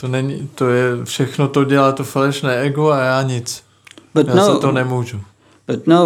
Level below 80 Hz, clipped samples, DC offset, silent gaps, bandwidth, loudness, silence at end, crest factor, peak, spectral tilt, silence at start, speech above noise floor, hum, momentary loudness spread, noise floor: -64 dBFS; under 0.1%; under 0.1%; none; 16.5 kHz; -16 LUFS; 0 s; 16 dB; 0 dBFS; -6 dB/octave; 0 s; 29 dB; none; 12 LU; -45 dBFS